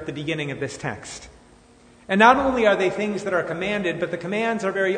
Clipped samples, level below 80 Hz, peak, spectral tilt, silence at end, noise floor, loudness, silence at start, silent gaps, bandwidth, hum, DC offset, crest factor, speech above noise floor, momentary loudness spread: under 0.1%; -52 dBFS; 0 dBFS; -5 dB/octave; 0 s; -52 dBFS; -22 LUFS; 0 s; none; 9.6 kHz; none; under 0.1%; 22 dB; 30 dB; 16 LU